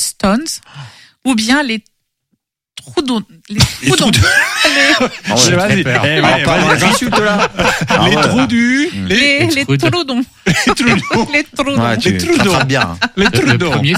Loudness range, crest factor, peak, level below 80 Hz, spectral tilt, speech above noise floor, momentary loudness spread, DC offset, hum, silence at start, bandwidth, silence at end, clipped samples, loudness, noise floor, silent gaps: 5 LU; 12 dB; 0 dBFS; -36 dBFS; -4 dB/octave; 55 dB; 7 LU; under 0.1%; none; 0 s; 16 kHz; 0 s; under 0.1%; -12 LUFS; -67 dBFS; none